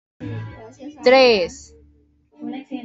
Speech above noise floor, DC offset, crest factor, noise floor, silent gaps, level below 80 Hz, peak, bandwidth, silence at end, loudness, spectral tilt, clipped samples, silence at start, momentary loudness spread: 38 dB; under 0.1%; 20 dB; -56 dBFS; none; -54 dBFS; -2 dBFS; 7.8 kHz; 0.05 s; -16 LUFS; -4.5 dB/octave; under 0.1%; 0.2 s; 24 LU